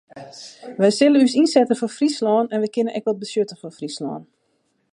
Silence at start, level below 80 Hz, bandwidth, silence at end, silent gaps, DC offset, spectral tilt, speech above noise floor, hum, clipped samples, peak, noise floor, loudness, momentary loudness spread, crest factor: 0.15 s; -74 dBFS; 11.5 kHz; 0.7 s; none; under 0.1%; -5 dB/octave; 48 dB; none; under 0.1%; -2 dBFS; -68 dBFS; -19 LUFS; 21 LU; 18 dB